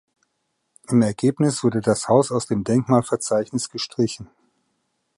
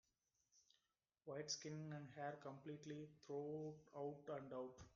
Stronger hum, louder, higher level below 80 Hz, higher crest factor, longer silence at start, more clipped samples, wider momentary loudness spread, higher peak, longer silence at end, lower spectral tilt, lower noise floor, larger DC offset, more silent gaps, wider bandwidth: neither; first, -21 LUFS vs -53 LUFS; first, -58 dBFS vs -84 dBFS; about the same, 20 dB vs 20 dB; first, 0.9 s vs 0.55 s; neither; about the same, 7 LU vs 7 LU; first, -2 dBFS vs -34 dBFS; first, 0.9 s vs 0 s; about the same, -6 dB/octave vs -5 dB/octave; second, -74 dBFS vs under -90 dBFS; neither; neither; first, 11.5 kHz vs 7.2 kHz